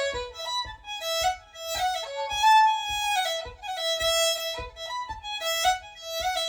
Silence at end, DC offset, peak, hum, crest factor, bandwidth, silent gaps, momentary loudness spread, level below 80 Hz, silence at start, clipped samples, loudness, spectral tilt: 0 s; under 0.1%; -10 dBFS; none; 16 dB; over 20 kHz; none; 14 LU; -50 dBFS; 0 s; under 0.1%; -26 LUFS; 0.5 dB/octave